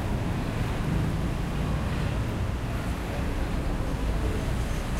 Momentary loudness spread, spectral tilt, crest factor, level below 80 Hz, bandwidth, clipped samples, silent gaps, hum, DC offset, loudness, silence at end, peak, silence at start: 3 LU; -6.5 dB/octave; 12 dB; -32 dBFS; 16 kHz; under 0.1%; none; none; under 0.1%; -30 LUFS; 0 s; -16 dBFS; 0 s